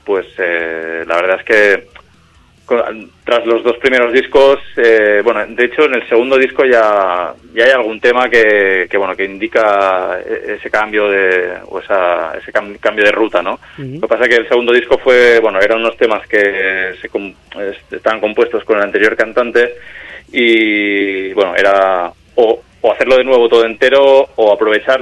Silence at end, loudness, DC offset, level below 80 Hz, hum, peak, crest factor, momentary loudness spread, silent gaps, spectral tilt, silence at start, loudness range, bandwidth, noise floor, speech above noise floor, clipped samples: 0 s; -12 LUFS; under 0.1%; -48 dBFS; none; 0 dBFS; 12 dB; 10 LU; none; -4.5 dB/octave; 0.05 s; 4 LU; 11 kHz; -47 dBFS; 35 dB; 0.1%